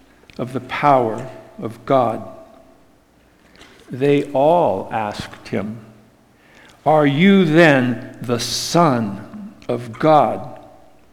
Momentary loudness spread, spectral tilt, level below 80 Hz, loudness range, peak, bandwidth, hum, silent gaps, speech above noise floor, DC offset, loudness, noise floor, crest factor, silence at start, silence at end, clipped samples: 19 LU; -5.5 dB/octave; -54 dBFS; 6 LU; 0 dBFS; 16.5 kHz; none; none; 37 dB; under 0.1%; -17 LUFS; -53 dBFS; 18 dB; 0.4 s; 0.55 s; under 0.1%